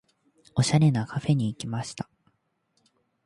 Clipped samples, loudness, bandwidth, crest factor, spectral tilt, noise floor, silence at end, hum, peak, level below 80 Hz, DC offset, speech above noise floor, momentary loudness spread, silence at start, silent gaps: under 0.1%; -26 LUFS; 11.5 kHz; 18 dB; -6 dB/octave; -73 dBFS; 1.25 s; none; -10 dBFS; -60 dBFS; under 0.1%; 48 dB; 16 LU; 0.55 s; none